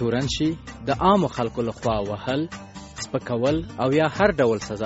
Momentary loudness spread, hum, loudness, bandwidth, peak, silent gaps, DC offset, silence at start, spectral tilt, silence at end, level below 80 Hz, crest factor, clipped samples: 12 LU; none; -23 LUFS; 8 kHz; -4 dBFS; none; under 0.1%; 0 s; -5 dB/octave; 0 s; -44 dBFS; 20 dB; under 0.1%